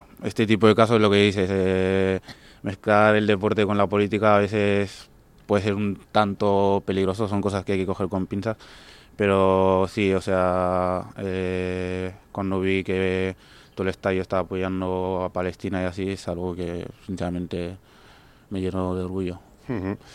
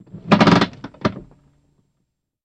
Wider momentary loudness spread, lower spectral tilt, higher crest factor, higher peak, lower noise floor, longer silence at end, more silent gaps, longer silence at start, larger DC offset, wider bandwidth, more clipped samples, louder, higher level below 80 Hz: about the same, 12 LU vs 12 LU; about the same, -7 dB/octave vs -6.5 dB/octave; about the same, 22 dB vs 20 dB; about the same, -2 dBFS vs -2 dBFS; second, -51 dBFS vs -74 dBFS; second, 0 s vs 1.25 s; neither; about the same, 0.2 s vs 0.15 s; neither; first, 12 kHz vs 8.8 kHz; neither; second, -23 LUFS vs -17 LUFS; about the same, -52 dBFS vs -48 dBFS